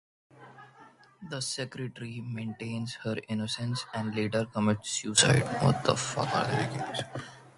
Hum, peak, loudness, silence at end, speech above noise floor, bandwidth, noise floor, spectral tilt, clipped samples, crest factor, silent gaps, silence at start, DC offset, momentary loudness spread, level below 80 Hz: none; -6 dBFS; -30 LUFS; 0.05 s; 26 dB; 11.5 kHz; -56 dBFS; -4 dB/octave; under 0.1%; 24 dB; none; 0.35 s; under 0.1%; 14 LU; -62 dBFS